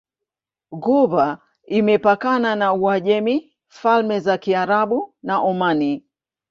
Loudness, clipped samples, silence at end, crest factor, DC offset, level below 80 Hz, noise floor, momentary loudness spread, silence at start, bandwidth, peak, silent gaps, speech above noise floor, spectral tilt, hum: -19 LUFS; under 0.1%; 0.5 s; 16 dB; under 0.1%; -64 dBFS; -85 dBFS; 8 LU; 0.7 s; 7.2 kHz; -4 dBFS; none; 67 dB; -7 dB/octave; none